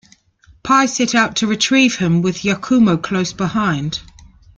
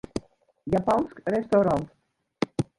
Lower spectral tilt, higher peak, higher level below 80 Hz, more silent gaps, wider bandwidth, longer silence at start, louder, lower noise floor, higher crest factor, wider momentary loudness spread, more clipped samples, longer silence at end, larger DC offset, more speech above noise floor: second, -4.5 dB/octave vs -7 dB/octave; first, -2 dBFS vs -8 dBFS; about the same, -48 dBFS vs -52 dBFS; neither; second, 9.2 kHz vs 11.5 kHz; first, 0.65 s vs 0.15 s; first, -16 LUFS vs -26 LUFS; about the same, -51 dBFS vs -48 dBFS; about the same, 16 dB vs 18 dB; second, 8 LU vs 15 LU; neither; first, 0.6 s vs 0.15 s; neither; first, 35 dB vs 24 dB